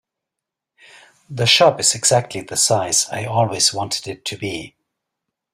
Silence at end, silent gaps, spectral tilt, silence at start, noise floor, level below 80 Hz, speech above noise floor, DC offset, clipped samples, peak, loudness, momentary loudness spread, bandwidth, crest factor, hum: 0.85 s; none; -2 dB/octave; 1.3 s; -84 dBFS; -58 dBFS; 65 dB; under 0.1%; under 0.1%; 0 dBFS; -17 LUFS; 15 LU; 16 kHz; 20 dB; none